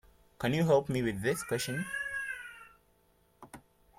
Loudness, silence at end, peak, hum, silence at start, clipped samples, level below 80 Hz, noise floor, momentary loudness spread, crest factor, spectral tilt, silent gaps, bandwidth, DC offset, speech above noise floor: -32 LUFS; 0.4 s; -14 dBFS; none; 0.4 s; under 0.1%; -62 dBFS; -69 dBFS; 25 LU; 20 dB; -5.5 dB/octave; none; 16.5 kHz; under 0.1%; 38 dB